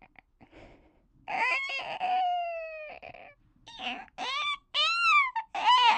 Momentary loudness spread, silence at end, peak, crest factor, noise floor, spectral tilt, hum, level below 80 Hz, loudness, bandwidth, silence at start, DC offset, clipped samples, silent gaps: 19 LU; 0 s; -10 dBFS; 20 dB; -62 dBFS; 0 dB/octave; none; -66 dBFS; -28 LUFS; 9.6 kHz; 0.55 s; under 0.1%; under 0.1%; none